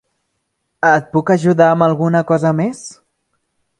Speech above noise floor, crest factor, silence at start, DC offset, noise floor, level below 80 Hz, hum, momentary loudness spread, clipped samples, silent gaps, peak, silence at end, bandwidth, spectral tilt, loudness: 57 dB; 16 dB; 0.85 s; under 0.1%; -71 dBFS; -60 dBFS; none; 10 LU; under 0.1%; none; 0 dBFS; 0.9 s; 11 kHz; -7 dB/octave; -14 LUFS